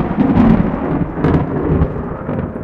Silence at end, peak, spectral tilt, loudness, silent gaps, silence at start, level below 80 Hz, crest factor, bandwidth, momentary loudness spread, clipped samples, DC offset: 0 s; 0 dBFS; -10.5 dB/octave; -15 LUFS; none; 0 s; -26 dBFS; 14 dB; 5.2 kHz; 10 LU; under 0.1%; under 0.1%